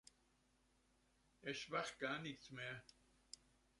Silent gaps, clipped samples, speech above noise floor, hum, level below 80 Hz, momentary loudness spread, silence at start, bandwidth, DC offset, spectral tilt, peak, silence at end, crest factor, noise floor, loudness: none; under 0.1%; 30 dB; none; -80 dBFS; 16 LU; 1.4 s; 11.5 kHz; under 0.1%; -3.5 dB/octave; -28 dBFS; 0.45 s; 24 dB; -79 dBFS; -48 LUFS